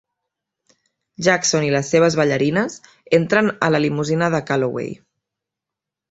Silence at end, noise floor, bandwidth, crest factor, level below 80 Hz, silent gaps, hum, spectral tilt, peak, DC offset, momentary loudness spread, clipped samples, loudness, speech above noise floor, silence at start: 1.15 s; -85 dBFS; 8 kHz; 20 dB; -58 dBFS; none; none; -4.5 dB/octave; -2 dBFS; under 0.1%; 11 LU; under 0.1%; -18 LUFS; 67 dB; 1.2 s